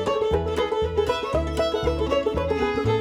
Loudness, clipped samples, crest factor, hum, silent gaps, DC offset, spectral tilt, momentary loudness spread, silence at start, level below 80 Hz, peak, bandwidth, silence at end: -24 LUFS; under 0.1%; 14 dB; none; none; under 0.1%; -6 dB/octave; 2 LU; 0 s; -34 dBFS; -8 dBFS; 14 kHz; 0 s